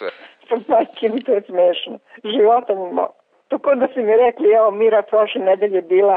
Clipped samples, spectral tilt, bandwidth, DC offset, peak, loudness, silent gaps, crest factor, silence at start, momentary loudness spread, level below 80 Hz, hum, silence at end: under 0.1%; -8 dB/octave; 4.4 kHz; under 0.1%; -6 dBFS; -17 LUFS; none; 10 dB; 0 s; 11 LU; -66 dBFS; none; 0 s